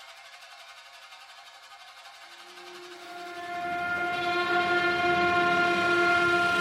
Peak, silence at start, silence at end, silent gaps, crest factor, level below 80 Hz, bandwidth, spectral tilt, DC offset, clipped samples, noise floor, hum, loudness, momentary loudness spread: -12 dBFS; 0 s; 0 s; none; 16 dB; -64 dBFS; 14.5 kHz; -4 dB/octave; under 0.1%; under 0.1%; -49 dBFS; none; -25 LUFS; 24 LU